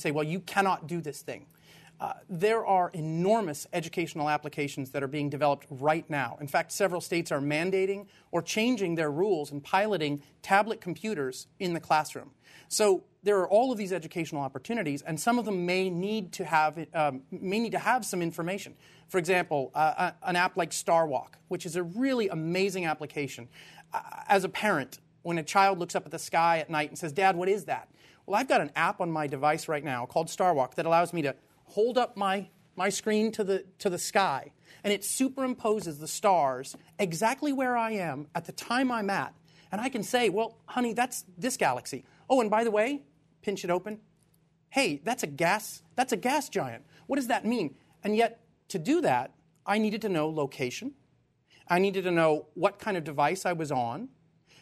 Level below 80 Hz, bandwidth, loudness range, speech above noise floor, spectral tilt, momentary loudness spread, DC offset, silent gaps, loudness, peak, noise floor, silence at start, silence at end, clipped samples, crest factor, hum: -74 dBFS; 13.5 kHz; 2 LU; 39 dB; -4.5 dB/octave; 11 LU; under 0.1%; none; -29 LUFS; -8 dBFS; -68 dBFS; 0 s; 0.55 s; under 0.1%; 20 dB; none